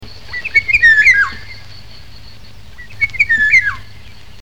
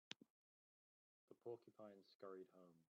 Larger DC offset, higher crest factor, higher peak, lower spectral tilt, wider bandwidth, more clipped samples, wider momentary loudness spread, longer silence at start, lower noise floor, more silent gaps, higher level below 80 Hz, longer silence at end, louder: first, 3% vs under 0.1%; second, 14 dB vs 34 dB; first, 0 dBFS vs -30 dBFS; second, -1.5 dB/octave vs -3 dB/octave; first, 18 kHz vs 6.2 kHz; neither; first, 19 LU vs 6 LU; about the same, 0 s vs 0.1 s; second, -38 dBFS vs under -90 dBFS; second, none vs 0.30-1.28 s, 2.15-2.20 s; first, -40 dBFS vs under -90 dBFS; first, 0.6 s vs 0.15 s; first, -10 LUFS vs -61 LUFS